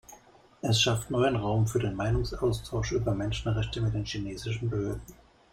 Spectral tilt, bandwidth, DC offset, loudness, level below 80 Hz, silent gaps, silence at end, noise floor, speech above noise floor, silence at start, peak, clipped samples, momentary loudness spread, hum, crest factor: -5.5 dB/octave; 16 kHz; under 0.1%; -29 LUFS; -42 dBFS; none; 0.4 s; -56 dBFS; 28 dB; 0.1 s; -10 dBFS; under 0.1%; 9 LU; none; 18 dB